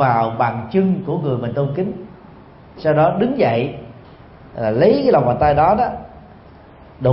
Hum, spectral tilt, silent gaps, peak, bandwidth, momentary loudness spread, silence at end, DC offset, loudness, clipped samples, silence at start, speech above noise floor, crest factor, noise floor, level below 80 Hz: none; -12.5 dB/octave; none; -2 dBFS; 5.8 kHz; 12 LU; 0 s; under 0.1%; -17 LUFS; under 0.1%; 0 s; 26 dB; 16 dB; -42 dBFS; -42 dBFS